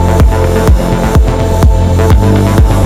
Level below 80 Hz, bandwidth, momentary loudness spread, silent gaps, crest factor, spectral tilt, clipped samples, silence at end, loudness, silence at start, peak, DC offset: -10 dBFS; 15 kHz; 2 LU; none; 6 dB; -7 dB/octave; under 0.1%; 0 s; -9 LUFS; 0 s; 0 dBFS; under 0.1%